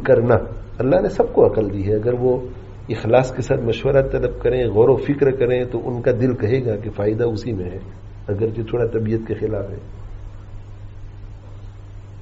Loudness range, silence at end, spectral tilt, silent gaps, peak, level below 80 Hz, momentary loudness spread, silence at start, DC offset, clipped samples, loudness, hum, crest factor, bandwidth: 7 LU; 0 s; -7.5 dB/octave; none; 0 dBFS; -36 dBFS; 23 LU; 0 s; under 0.1%; under 0.1%; -19 LUFS; none; 18 dB; 7.8 kHz